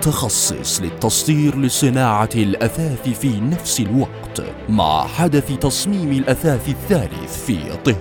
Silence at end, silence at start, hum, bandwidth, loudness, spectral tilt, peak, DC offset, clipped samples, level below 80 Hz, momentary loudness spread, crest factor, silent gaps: 0 s; 0 s; none; 17.5 kHz; -18 LUFS; -4.5 dB/octave; 0 dBFS; under 0.1%; under 0.1%; -38 dBFS; 7 LU; 18 dB; none